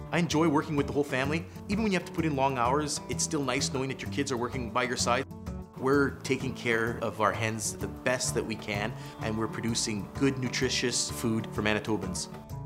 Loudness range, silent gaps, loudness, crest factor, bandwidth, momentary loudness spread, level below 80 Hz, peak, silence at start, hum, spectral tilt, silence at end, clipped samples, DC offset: 2 LU; none; -30 LUFS; 20 dB; 16 kHz; 7 LU; -50 dBFS; -8 dBFS; 0 s; none; -4 dB/octave; 0 s; under 0.1%; under 0.1%